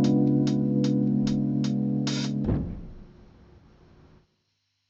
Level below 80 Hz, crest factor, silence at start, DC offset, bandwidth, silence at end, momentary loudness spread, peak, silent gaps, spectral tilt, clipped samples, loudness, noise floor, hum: -46 dBFS; 14 dB; 0 s; under 0.1%; 7.8 kHz; 1.8 s; 9 LU; -12 dBFS; none; -7.5 dB/octave; under 0.1%; -25 LUFS; -75 dBFS; none